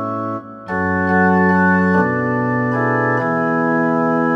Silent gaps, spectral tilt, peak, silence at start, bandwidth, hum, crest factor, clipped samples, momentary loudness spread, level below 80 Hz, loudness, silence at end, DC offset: none; -9.5 dB/octave; -4 dBFS; 0 s; 6.2 kHz; none; 12 dB; under 0.1%; 9 LU; -54 dBFS; -16 LUFS; 0 s; under 0.1%